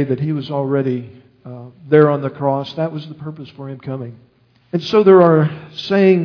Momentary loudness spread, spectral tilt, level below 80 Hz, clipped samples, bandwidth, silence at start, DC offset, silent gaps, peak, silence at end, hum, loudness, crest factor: 22 LU; -8.5 dB/octave; -62 dBFS; under 0.1%; 5.4 kHz; 0 s; under 0.1%; none; 0 dBFS; 0 s; none; -15 LUFS; 16 dB